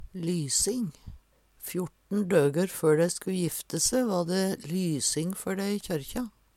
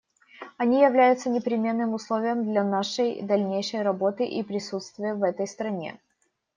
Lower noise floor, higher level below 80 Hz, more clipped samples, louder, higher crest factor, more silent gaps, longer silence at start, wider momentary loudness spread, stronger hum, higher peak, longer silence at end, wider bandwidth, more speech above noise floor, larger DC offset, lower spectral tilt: second, -55 dBFS vs -73 dBFS; first, -54 dBFS vs -76 dBFS; neither; second, -28 LUFS vs -25 LUFS; about the same, 18 dB vs 18 dB; neither; second, 0 s vs 0.4 s; about the same, 10 LU vs 11 LU; neither; second, -10 dBFS vs -6 dBFS; second, 0.3 s vs 0.65 s; first, 17 kHz vs 9.6 kHz; second, 27 dB vs 49 dB; neither; about the same, -4.5 dB/octave vs -5.5 dB/octave